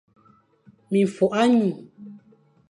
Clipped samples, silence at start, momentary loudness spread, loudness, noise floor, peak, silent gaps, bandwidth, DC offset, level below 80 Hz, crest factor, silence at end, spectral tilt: under 0.1%; 0.9 s; 18 LU; -21 LUFS; -59 dBFS; -6 dBFS; none; 11 kHz; under 0.1%; -70 dBFS; 18 dB; 0.55 s; -6.5 dB/octave